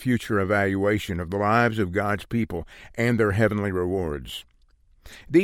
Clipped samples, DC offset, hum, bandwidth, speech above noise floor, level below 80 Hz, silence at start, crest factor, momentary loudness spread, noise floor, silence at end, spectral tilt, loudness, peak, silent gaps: under 0.1%; under 0.1%; none; 16 kHz; 35 dB; -46 dBFS; 0 s; 18 dB; 11 LU; -58 dBFS; 0 s; -7 dB/octave; -24 LUFS; -6 dBFS; none